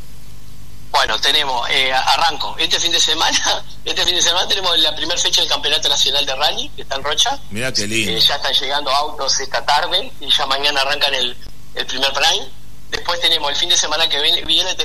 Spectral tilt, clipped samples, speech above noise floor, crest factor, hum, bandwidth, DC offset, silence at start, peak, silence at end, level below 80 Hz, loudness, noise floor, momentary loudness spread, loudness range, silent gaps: -0.5 dB/octave; under 0.1%; 22 dB; 16 dB; 50 Hz at -40 dBFS; 13.5 kHz; 6%; 0 s; -2 dBFS; 0 s; -42 dBFS; -15 LUFS; -39 dBFS; 8 LU; 3 LU; none